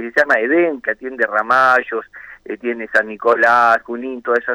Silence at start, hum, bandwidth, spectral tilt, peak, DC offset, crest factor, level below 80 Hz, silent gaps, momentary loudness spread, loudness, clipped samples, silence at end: 0 s; none; 13 kHz; -4.5 dB/octave; -2 dBFS; under 0.1%; 14 dB; -60 dBFS; none; 14 LU; -16 LUFS; under 0.1%; 0 s